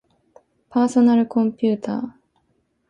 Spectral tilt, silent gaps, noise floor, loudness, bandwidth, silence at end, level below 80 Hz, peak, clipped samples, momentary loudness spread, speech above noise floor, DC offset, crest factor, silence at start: -7 dB/octave; none; -67 dBFS; -20 LUFS; 9.4 kHz; 0.8 s; -66 dBFS; -6 dBFS; under 0.1%; 12 LU; 49 dB; under 0.1%; 14 dB; 0.75 s